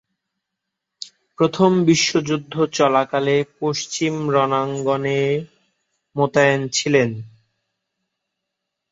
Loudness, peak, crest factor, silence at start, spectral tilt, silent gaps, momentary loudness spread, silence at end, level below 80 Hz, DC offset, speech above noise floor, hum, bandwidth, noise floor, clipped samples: -19 LUFS; -2 dBFS; 18 dB; 1 s; -4.5 dB/octave; none; 10 LU; 1.65 s; -62 dBFS; under 0.1%; 62 dB; none; 8 kHz; -81 dBFS; under 0.1%